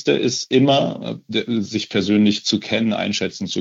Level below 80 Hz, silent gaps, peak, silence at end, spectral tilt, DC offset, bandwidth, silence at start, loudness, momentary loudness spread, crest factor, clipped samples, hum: -62 dBFS; none; -4 dBFS; 0 s; -4.5 dB/octave; under 0.1%; 8 kHz; 0 s; -19 LUFS; 8 LU; 16 dB; under 0.1%; none